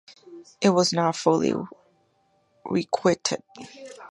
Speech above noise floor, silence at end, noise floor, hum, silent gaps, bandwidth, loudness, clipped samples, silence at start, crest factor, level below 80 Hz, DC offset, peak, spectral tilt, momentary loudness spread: 42 dB; 0.05 s; -67 dBFS; none; none; 11.5 kHz; -24 LUFS; under 0.1%; 0.1 s; 22 dB; -66 dBFS; under 0.1%; -4 dBFS; -4.5 dB/octave; 21 LU